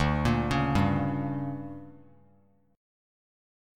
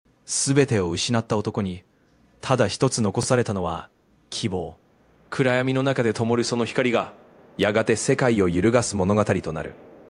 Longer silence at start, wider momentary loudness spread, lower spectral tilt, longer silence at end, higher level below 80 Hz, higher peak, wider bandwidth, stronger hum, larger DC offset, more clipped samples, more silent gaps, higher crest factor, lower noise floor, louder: second, 0 s vs 0.3 s; about the same, 15 LU vs 13 LU; first, -7 dB/octave vs -5 dB/octave; first, 1 s vs 0.15 s; first, -42 dBFS vs -52 dBFS; second, -12 dBFS vs -4 dBFS; first, 13 kHz vs 11 kHz; neither; neither; neither; neither; about the same, 18 dB vs 20 dB; first, -64 dBFS vs -59 dBFS; second, -28 LUFS vs -23 LUFS